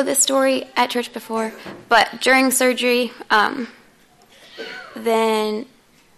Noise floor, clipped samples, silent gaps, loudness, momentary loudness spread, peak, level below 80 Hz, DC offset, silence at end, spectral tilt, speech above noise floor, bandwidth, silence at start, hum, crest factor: -52 dBFS; under 0.1%; none; -18 LUFS; 17 LU; -2 dBFS; -62 dBFS; under 0.1%; 0.55 s; -1.5 dB/octave; 34 dB; 13.5 kHz; 0 s; none; 18 dB